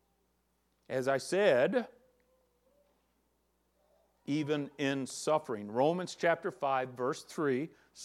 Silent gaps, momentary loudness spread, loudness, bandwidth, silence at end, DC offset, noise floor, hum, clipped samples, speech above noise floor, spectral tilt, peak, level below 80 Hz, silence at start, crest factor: none; 9 LU; -33 LUFS; 14 kHz; 0 s; under 0.1%; -76 dBFS; none; under 0.1%; 44 dB; -5 dB/octave; -14 dBFS; -80 dBFS; 0.9 s; 20 dB